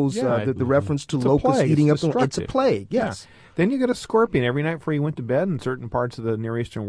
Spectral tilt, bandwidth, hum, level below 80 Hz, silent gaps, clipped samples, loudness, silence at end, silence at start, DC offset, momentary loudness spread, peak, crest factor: -7 dB/octave; 11 kHz; none; -48 dBFS; none; under 0.1%; -22 LUFS; 0 s; 0 s; under 0.1%; 8 LU; -6 dBFS; 16 dB